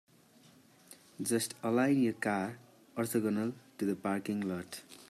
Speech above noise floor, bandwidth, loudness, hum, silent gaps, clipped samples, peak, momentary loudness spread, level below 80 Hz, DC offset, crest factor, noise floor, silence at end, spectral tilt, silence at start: 29 dB; 15 kHz; -34 LUFS; none; none; under 0.1%; -18 dBFS; 13 LU; -80 dBFS; under 0.1%; 18 dB; -62 dBFS; 0.05 s; -5 dB/octave; 0.9 s